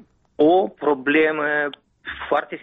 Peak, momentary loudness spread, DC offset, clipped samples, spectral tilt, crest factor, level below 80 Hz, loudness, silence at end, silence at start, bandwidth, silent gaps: -6 dBFS; 15 LU; under 0.1%; under 0.1%; -7.5 dB/octave; 14 dB; -58 dBFS; -20 LUFS; 0.05 s; 0.4 s; 4.5 kHz; none